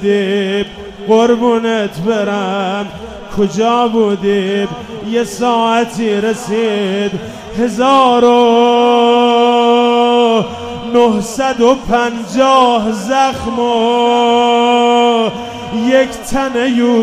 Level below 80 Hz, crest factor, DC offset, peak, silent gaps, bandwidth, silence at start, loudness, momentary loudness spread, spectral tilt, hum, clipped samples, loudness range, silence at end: -42 dBFS; 12 dB; under 0.1%; 0 dBFS; none; 14.5 kHz; 0 s; -12 LUFS; 9 LU; -5 dB/octave; none; under 0.1%; 5 LU; 0 s